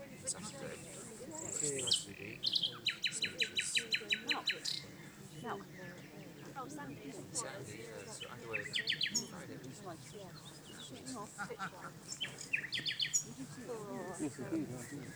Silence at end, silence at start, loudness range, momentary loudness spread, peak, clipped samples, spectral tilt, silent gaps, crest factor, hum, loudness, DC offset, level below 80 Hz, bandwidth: 0 s; 0 s; 10 LU; 16 LU; -18 dBFS; under 0.1%; -1.5 dB/octave; none; 24 dB; none; -39 LUFS; under 0.1%; -74 dBFS; over 20 kHz